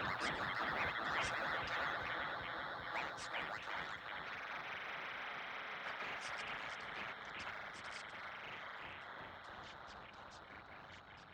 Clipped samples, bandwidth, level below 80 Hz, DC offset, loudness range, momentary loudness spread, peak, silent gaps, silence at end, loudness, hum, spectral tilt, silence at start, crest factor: under 0.1%; over 20 kHz; -70 dBFS; under 0.1%; 9 LU; 15 LU; -26 dBFS; none; 0 s; -43 LUFS; none; -3 dB/octave; 0 s; 20 dB